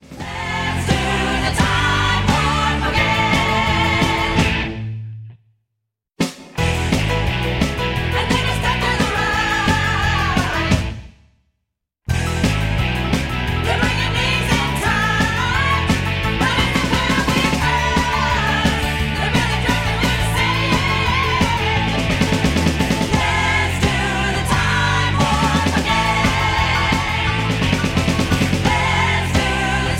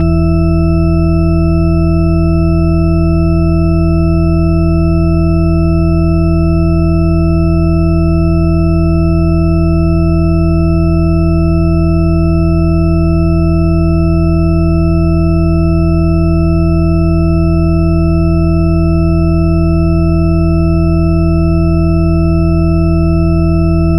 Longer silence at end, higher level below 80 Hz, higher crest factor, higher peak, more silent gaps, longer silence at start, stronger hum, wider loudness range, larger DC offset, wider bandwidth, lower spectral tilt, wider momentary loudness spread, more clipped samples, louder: about the same, 0 s vs 0 s; second, -28 dBFS vs -18 dBFS; first, 16 dB vs 8 dB; about the same, -2 dBFS vs -2 dBFS; neither; about the same, 0.1 s vs 0 s; neither; first, 4 LU vs 0 LU; neither; first, 16.5 kHz vs 11 kHz; second, -4.5 dB/octave vs -10.5 dB/octave; first, 4 LU vs 0 LU; neither; second, -17 LUFS vs -11 LUFS